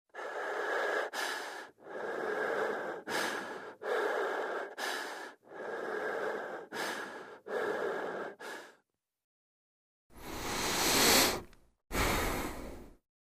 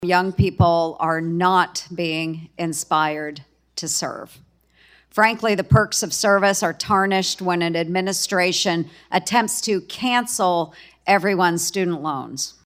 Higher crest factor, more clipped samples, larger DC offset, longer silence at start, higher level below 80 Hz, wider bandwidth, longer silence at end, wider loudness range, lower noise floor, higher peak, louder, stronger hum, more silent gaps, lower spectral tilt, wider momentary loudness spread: first, 24 dB vs 18 dB; neither; neither; first, 0.15 s vs 0 s; second, -52 dBFS vs -46 dBFS; about the same, 15.5 kHz vs 16 kHz; first, 0.35 s vs 0.15 s; first, 9 LU vs 4 LU; first, -75 dBFS vs -55 dBFS; second, -12 dBFS vs -2 dBFS; second, -34 LUFS vs -20 LUFS; neither; first, 9.24-10.10 s vs none; second, -2 dB/octave vs -4 dB/octave; first, 16 LU vs 10 LU